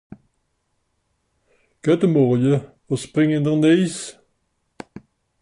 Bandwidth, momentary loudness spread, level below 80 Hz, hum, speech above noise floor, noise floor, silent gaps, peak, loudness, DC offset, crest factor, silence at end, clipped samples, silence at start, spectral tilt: 11.5 kHz; 20 LU; -62 dBFS; none; 53 dB; -70 dBFS; none; -4 dBFS; -19 LUFS; under 0.1%; 16 dB; 0.45 s; under 0.1%; 1.85 s; -7 dB/octave